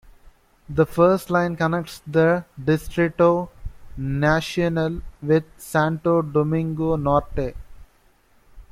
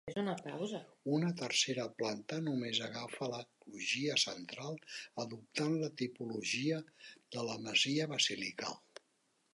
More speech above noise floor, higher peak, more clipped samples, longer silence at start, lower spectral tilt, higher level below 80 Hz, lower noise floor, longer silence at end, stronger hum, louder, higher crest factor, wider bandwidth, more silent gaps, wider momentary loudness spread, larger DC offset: about the same, 37 dB vs 39 dB; first, -4 dBFS vs -18 dBFS; neither; about the same, 0.05 s vs 0.05 s; first, -7 dB/octave vs -3.5 dB/octave; first, -40 dBFS vs -82 dBFS; second, -58 dBFS vs -77 dBFS; second, 0.1 s vs 0.75 s; neither; first, -22 LUFS vs -37 LUFS; about the same, 18 dB vs 20 dB; first, 16 kHz vs 11.5 kHz; neither; about the same, 11 LU vs 12 LU; neither